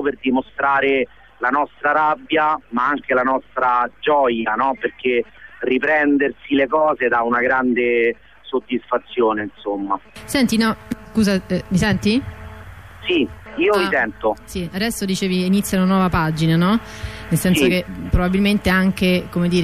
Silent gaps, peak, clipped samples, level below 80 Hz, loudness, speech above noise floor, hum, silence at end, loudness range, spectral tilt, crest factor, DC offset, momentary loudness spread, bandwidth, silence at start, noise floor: none; -6 dBFS; under 0.1%; -38 dBFS; -19 LUFS; 20 dB; none; 0 s; 3 LU; -5.5 dB/octave; 14 dB; 0.3%; 9 LU; 15.5 kHz; 0 s; -38 dBFS